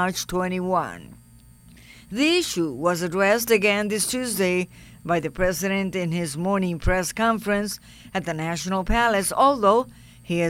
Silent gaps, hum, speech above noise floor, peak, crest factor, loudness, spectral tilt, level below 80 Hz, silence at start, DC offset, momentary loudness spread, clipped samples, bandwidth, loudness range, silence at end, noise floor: none; none; 27 dB; -6 dBFS; 18 dB; -23 LUFS; -4 dB/octave; -40 dBFS; 0 s; under 0.1%; 11 LU; under 0.1%; 16.5 kHz; 3 LU; 0 s; -50 dBFS